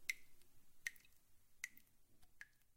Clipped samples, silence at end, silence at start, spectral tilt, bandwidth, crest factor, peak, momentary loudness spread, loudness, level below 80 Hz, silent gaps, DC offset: under 0.1%; 0 s; 0 s; 1.5 dB/octave; 16.5 kHz; 32 dB; -22 dBFS; 16 LU; -53 LUFS; -76 dBFS; none; under 0.1%